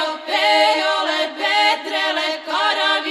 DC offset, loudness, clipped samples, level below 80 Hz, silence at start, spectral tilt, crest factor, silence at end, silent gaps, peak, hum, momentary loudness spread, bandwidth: under 0.1%; -17 LUFS; under 0.1%; -80 dBFS; 0 s; 1 dB/octave; 16 dB; 0 s; none; -2 dBFS; none; 6 LU; 14 kHz